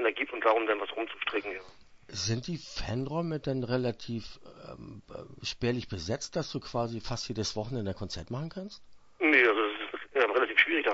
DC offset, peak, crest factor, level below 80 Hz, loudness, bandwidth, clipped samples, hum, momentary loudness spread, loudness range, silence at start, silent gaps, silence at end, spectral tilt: under 0.1%; -8 dBFS; 24 dB; -54 dBFS; -30 LUFS; 8 kHz; under 0.1%; none; 19 LU; 7 LU; 0 s; none; 0 s; -4.5 dB/octave